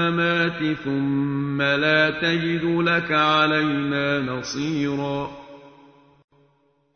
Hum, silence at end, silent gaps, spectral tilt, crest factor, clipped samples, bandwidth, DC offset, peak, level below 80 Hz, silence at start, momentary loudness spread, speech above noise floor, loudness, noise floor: none; 1.25 s; none; -5.5 dB/octave; 18 dB; under 0.1%; 6.6 kHz; under 0.1%; -6 dBFS; -56 dBFS; 0 s; 9 LU; 42 dB; -21 LUFS; -63 dBFS